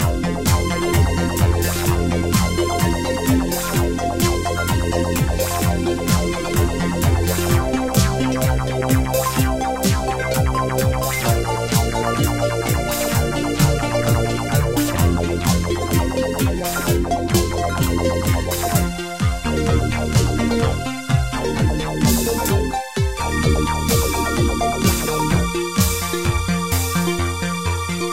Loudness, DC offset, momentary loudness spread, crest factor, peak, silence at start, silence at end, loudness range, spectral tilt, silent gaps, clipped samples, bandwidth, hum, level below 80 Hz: -19 LUFS; under 0.1%; 3 LU; 16 dB; -2 dBFS; 0 s; 0 s; 1 LU; -5 dB/octave; none; under 0.1%; 17 kHz; none; -26 dBFS